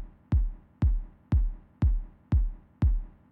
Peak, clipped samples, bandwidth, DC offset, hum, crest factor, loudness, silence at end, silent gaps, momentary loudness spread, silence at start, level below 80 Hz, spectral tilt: -16 dBFS; under 0.1%; 3.7 kHz; under 0.1%; none; 12 dB; -31 LUFS; 0.25 s; none; 8 LU; 0 s; -28 dBFS; -10.5 dB/octave